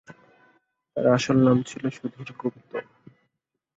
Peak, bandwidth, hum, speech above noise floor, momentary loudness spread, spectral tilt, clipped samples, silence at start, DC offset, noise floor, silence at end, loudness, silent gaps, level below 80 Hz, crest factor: -6 dBFS; 8 kHz; none; 56 dB; 17 LU; -6.5 dB/octave; under 0.1%; 0.1 s; under 0.1%; -79 dBFS; 0.95 s; -24 LUFS; none; -64 dBFS; 20 dB